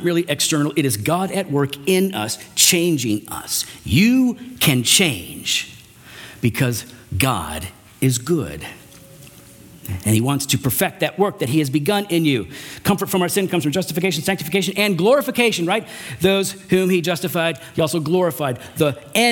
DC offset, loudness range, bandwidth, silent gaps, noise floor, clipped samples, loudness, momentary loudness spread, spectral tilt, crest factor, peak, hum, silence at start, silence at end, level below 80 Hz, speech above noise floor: under 0.1%; 5 LU; 18 kHz; none; -43 dBFS; under 0.1%; -19 LUFS; 10 LU; -4 dB/octave; 20 dB; 0 dBFS; none; 0 s; 0 s; -48 dBFS; 24 dB